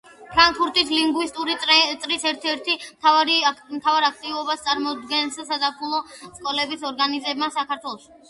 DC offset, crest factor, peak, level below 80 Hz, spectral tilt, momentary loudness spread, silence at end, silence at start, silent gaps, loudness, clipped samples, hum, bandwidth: under 0.1%; 20 dB; -2 dBFS; -56 dBFS; -1 dB/octave; 11 LU; 0.3 s; 0.2 s; none; -21 LUFS; under 0.1%; none; 11.5 kHz